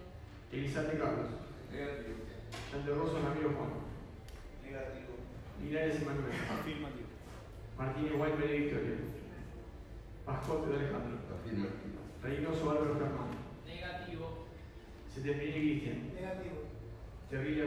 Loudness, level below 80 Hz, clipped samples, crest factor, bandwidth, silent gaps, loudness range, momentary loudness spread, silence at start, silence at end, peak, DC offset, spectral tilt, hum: -39 LUFS; -52 dBFS; under 0.1%; 16 dB; 15 kHz; none; 3 LU; 16 LU; 0 s; 0 s; -22 dBFS; under 0.1%; -7 dB/octave; none